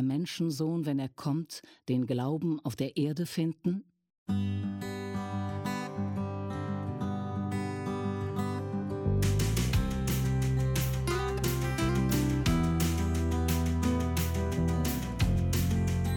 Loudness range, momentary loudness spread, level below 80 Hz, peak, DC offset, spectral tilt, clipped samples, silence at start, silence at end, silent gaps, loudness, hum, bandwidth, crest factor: 6 LU; 7 LU; -40 dBFS; -16 dBFS; under 0.1%; -6 dB/octave; under 0.1%; 0 s; 0 s; 4.18-4.26 s; -31 LUFS; none; 17.5 kHz; 14 dB